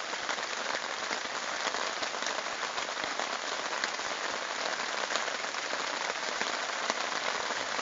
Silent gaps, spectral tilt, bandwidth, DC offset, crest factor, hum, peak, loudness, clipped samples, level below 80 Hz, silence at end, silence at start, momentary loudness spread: none; 2 dB/octave; 8 kHz; under 0.1%; 24 dB; none; -10 dBFS; -32 LUFS; under 0.1%; -76 dBFS; 0 s; 0 s; 2 LU